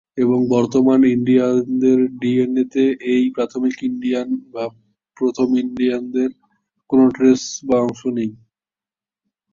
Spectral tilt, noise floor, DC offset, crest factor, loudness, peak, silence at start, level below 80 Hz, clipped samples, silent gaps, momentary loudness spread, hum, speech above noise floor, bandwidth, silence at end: -6 dB/octave; under -90 dBFS; under 0.1%; 16 dB; -18 LUFS; -2 dBFS; 0.15 s; -60 dBFS; under 0.1%; none; 9 LU; none; over 73 dB; 7.4 kHz; 1.2 s